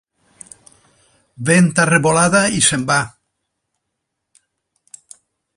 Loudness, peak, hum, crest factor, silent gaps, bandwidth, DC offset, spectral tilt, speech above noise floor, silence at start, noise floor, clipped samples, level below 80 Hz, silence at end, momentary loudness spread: -14 LUFS; 0 dBFS; none; 20 dB; none; 11.5 kHz; under 0.1%; -4 dB/octave; 62 dB; 1.4 s; -76 dBFS; under 0.1%; -54 dBFS; 2.5 s; 7 LU